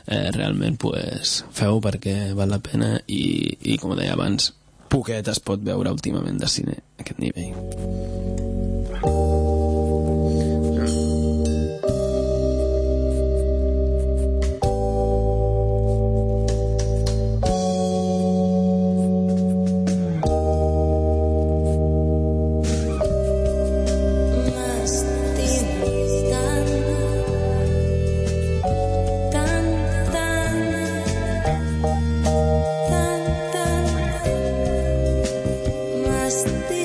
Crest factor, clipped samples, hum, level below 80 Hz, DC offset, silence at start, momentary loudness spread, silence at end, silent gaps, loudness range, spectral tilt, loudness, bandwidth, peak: 14 dB; under 0.1%; none; -26 dBFS; under 0.1%; 0.05 s; 4 LU; 0 s; none; 3 LU; -6 dB/octave; -22 LUFS; 11 kHz; -6 dBFS